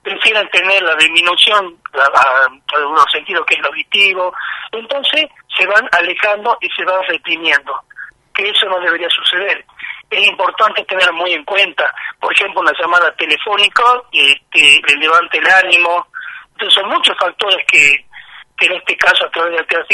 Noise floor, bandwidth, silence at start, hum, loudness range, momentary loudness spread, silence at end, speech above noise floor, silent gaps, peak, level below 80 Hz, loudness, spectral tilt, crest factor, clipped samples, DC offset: -37 dBFS; 15 kHz; 0.05 s; none; 5 LU; 10 LU; 0 s; 24 dB; none; 0 dBFS; -58 dBFS; -11 LUFS; 0 dB/octave; 14 dB; 0.1%; under 0.1%